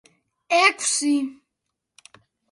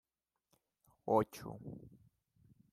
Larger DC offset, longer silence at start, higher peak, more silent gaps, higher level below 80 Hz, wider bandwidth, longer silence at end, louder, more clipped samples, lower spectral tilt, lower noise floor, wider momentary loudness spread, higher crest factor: neither; second, 0.5 s vs 1.05 s; first, -4 dBFS vs -16 dBFS; neither; second, -80 dBFS vs -72 dBFS; second, 11.5 kHz vs 15.5 kHz; first, 1.2 s vs 0.85 s; first, -20 LUFS vs -37 LUFS; neither; second, 0 dB/octave vs -7 dB/octave; second, -81 dBFS vs -88 dBFS; second, 8 LU vs 18 LU; about the same, 22 dB vs 26 dB